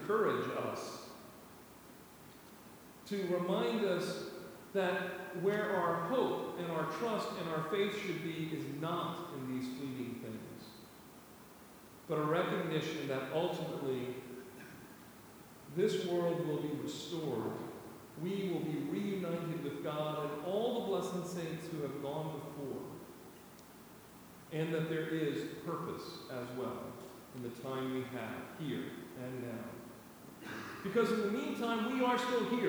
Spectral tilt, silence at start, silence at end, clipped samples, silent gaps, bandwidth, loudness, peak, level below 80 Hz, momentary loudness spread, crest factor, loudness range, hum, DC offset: -6 dB/octave; 0 s; 0 s; under 0.1%; none; over 20 kHz; -38 LUFS; -20 dBFS; -74 dBFS; 21 LU; 18 dB; 7 LU; none; under 0.1%